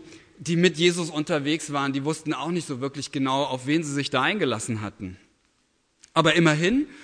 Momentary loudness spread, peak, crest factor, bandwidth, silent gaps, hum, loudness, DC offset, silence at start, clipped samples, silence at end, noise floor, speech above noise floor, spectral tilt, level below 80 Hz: 11 LU; -4 dBFS; 22 dB; 10.5 kHz; none; none; -24 LUFS; under 0.1%; 0 s; under 0.1%; 0 s; -68 dBFS; 44 dB; -4.5 dB/octave; -60 dBFS